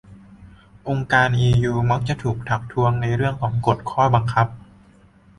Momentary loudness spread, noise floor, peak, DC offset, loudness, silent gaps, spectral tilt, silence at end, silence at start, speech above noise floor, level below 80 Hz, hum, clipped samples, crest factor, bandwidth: 8 LU; -51 dBFS; -4 dBFS; under 0.1%; -20 LUFS; none; -7 dB/octave; 0.8 s; 0.1 s; 32 dB; -44 dBFS; none; under 0.1%; 18 dB; 10.5 kHz